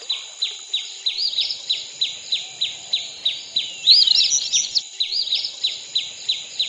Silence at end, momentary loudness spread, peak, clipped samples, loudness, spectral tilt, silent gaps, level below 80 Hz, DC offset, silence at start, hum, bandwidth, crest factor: 0 s; 12 LU; -2 dBFS; under 0.1%; -19 LUFS; 3.5 dB/octave; none; -72 dBFS; under 0.1%; 0 s; none; 10 kHz; 20 dB